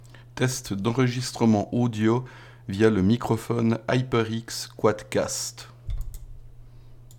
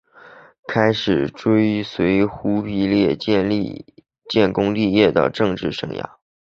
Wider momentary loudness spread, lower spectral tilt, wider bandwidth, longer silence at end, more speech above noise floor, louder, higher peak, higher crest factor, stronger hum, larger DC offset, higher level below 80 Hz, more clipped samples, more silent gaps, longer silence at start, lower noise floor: first, 16 LU vs 12 LU; second, -5.5 dB/octave vs -7 dB/octave; first, 18 kHz vs 7 kHz; second, 0 s vs 0.45 s; second, 21 dB vs 27 dB; second, -25 LUFS vs -19 LUFS; second, -6 dBFS vs -2 dBFS; about the same, 18 dB vs 18 dB; neither; neither; about the same, -44 dBFS vs -48 dBFS; neither; second, none vs 0.59-0.63 s; second, 0 s vs 0.25 s; about the same, -46 dBFS vs -45 dBFS